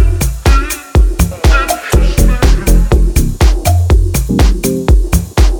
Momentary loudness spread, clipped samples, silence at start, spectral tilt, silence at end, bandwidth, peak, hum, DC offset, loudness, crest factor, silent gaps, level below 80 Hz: 3 LU; under 0.1%; 0 s; -5.5 dB/octave; 0 s; 19 kHz; 0 dBFS; none; under 0.1%; -12 LUFS; 8 dB; none; -10 dBFS